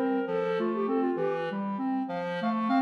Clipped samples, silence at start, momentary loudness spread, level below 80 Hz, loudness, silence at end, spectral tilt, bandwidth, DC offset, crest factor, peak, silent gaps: under 0.1%; 0 s; 4 LU; -86 dBFS; -30 LUFS; 0 s; -8 dB/octave; 6.4 kHz; under 0.1%; 14 dB; -14 dBFS; none